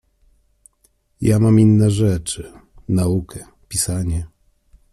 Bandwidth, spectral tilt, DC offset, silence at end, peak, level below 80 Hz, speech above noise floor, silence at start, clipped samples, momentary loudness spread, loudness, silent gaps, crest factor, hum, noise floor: 13.5 kHz; -6.5 dB/octave; under 0.1%; 0.65 s; -2 dBFS; -40 dBFS; 45 dB; 1.2 s; under 0.1%; 24 LU; -18 LUFS; none; 16 dB; none; -62 dBFS